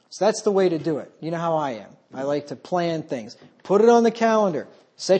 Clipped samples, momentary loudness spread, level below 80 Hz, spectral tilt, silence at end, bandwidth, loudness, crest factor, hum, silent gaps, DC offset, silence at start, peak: under 0.1%; 16 LU; -74 dBFS; -5.5 dB/octave; 0 s; 8.8 kHz; -22 LUFS; 18 dB; none; none; under 0.1%; 0.1 s; -4 dBFS